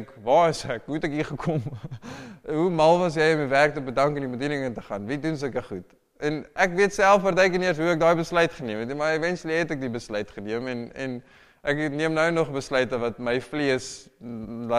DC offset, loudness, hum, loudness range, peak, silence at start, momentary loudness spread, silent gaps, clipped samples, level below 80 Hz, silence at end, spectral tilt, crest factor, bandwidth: under 0.1%; -24 LUFS; none; 5 LU; -6 dBFS; 0 s; 14 LU; none; under 0.1%; -52 dBFS; 0 s; -5.5 dB/octave; 18 dB; 14.5 kHz